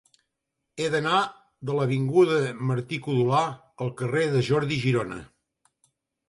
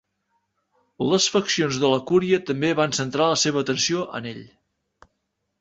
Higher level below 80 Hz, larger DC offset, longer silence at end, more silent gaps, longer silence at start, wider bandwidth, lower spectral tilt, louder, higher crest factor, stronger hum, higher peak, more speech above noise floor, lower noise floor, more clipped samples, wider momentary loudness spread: about the same, -62 dBFS vs -62 dBFS; neither; about the same, 1.05 s vs 1.15 s; neither; second, 0.75 s vs 1 s; first, 11.5 kHz vs 8.2 kHz; first, -6.5 dB/octave vs -3.5 dB/octave; second, -25 LUFS vs -21 LUFS; about the same, 16 dB vs 18 dB; neither; second, -10 dBFS vs -4 dBFS; about the same, 57 dB vs 54 dB; first, -82 dBFS vs -76 dBFS; neither; about the same, 12 LU vs 10 LU